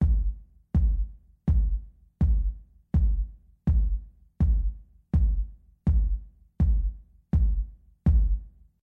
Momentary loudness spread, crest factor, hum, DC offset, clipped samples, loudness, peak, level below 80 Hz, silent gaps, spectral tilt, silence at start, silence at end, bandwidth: 11 LU; 14 dB; none; under 0.1%; under 0.1%; -28 LUFS; -12 dBFS; -26 dBFS; none; -11.5 dB/octave; 0 s; 0.35 s; 2.1 kHz